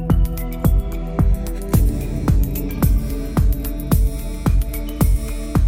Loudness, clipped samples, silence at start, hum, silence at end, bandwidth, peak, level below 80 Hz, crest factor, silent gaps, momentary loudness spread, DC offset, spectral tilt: -21 LUFS; under 0.1%; 0 s; none; 0 s; 16.5 kHz; -4 dBFS; -20 dBFS; 14 dB; none; 5 LU; under 0.1%; -7 dB/octave